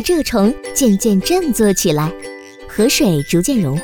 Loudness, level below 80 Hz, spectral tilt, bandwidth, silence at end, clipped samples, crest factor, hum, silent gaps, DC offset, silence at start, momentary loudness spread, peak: -15 LUFS; -36 dBFS; -4.5 dB/octave; over 20 kHz; 0 s; under 0.1%; 14 dB; none; none; under 0.1%; 0 s; 12 LU; -2 dBFS